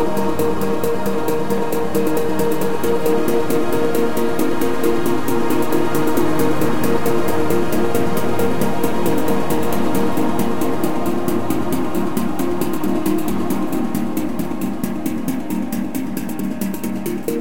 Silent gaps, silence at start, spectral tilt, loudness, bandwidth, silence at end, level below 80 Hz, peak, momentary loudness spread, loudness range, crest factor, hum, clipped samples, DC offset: none; 0 s; -6 dB/octave; -20 LUFS; 17.5 kHz; 0 s; -44 dBFS; -2 dBFS; 5 LU; 3 LU; 16 dB; none; under 0.1%; 10%